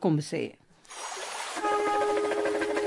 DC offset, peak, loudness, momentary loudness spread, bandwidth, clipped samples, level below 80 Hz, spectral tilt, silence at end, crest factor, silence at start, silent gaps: under 0.1%; -14 dBFS; -29 LUFS; 12 LU; 11.5 kHz; under 0.1%; -68 dBFS; -5 dB/octave; 0 s; 16 dB; 0 s; none